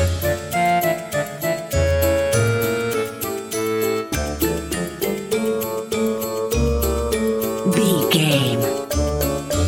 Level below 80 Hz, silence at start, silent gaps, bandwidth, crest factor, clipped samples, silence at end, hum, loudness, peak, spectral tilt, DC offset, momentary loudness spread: -32 dBFS; 0 s; none; 17 kHz; 16 dB; under 0.1%; 0 s; none; -21 LUFS; -4 dBFS; -5 dB/octave; under 0.1%; 7 LU